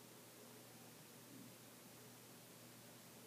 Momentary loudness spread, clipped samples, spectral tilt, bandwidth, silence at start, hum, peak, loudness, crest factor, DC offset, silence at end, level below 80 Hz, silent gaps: 1 LU; under 0.1%; -3 dB/octave; 15.5 kHz; 0 s; none; -48 dBFS; -59 LUFS; 14 dB; under 0.1%; 0 s; under -90 dBFS; none